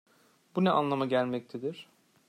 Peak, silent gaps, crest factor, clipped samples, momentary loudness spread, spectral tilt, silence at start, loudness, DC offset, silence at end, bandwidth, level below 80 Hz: -12 dBFS; none; 18 dB; under 0.1%; 12 LU; -7.5 dB/octave; 0.55 s; -30 LUFS; under 0.1%; 0.45 s; 10 kHz; -78 dBFS